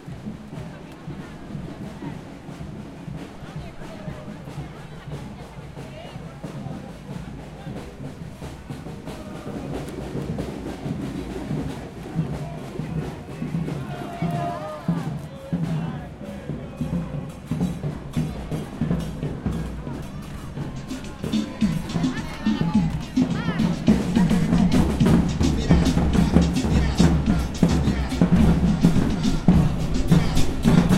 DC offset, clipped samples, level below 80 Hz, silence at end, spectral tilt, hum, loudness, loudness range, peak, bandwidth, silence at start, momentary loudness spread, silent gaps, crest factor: under 0.1%; under 0.1%; -32 dBFS; 0 s; -7 dB/octave; none; -24 LUFS; 16 LU; -2 dBFS; 13.5 kHz; 0 s; 17 LU; none; 22 dB